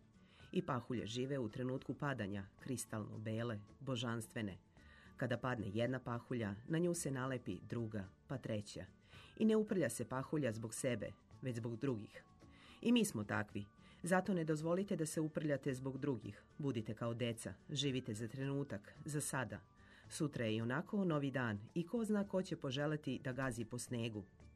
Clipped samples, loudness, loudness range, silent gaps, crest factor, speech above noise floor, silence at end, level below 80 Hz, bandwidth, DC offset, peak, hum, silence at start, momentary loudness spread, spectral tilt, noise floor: under 0.1%; -42 LUFS; 4 LU; none; 20 dB; 23 dB; 0 s; -70 dBFS; 13 kHz; under 0.1%; -22 dBFS; none; 0.4 s; 10 LU; -5.5 dB/octave; -64 dBFS